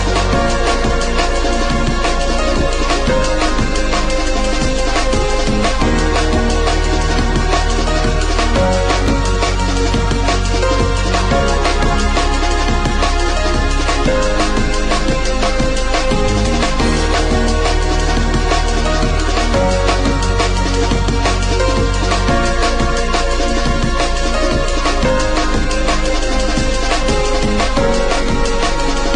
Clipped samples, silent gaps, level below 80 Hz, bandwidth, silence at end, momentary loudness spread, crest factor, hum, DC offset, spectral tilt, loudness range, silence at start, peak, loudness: under 0.1%; none; -16 dBFS; 10.5 kHz; 0 s; 2 LU; 12 dB; none; 1%; -4.5 dB/octave; 1 LU; 0 s; -2 dBFS; -16 LUFS